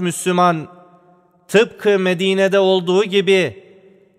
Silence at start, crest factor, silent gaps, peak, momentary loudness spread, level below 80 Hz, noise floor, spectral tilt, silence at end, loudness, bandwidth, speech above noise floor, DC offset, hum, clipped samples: 0 s; 16 dB; none; -2 dBFS; 3 LU; -66 dBFS; -53 dBFS; -5 dB/octave; 0.6 s; -16 LUFS; 14 kHz; 37 dB; under 0.1%; none; under 0.1%